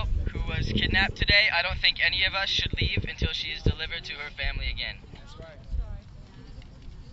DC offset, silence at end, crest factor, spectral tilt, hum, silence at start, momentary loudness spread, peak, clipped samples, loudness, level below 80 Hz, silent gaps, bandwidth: under 0.1%; 0 s; 20 dB; -4.5 dB/octave; none; 0 s; 18 LU; -8 dBFS; under 0.1%; -25 LUFS; -34 dBFS; none; 8 kHz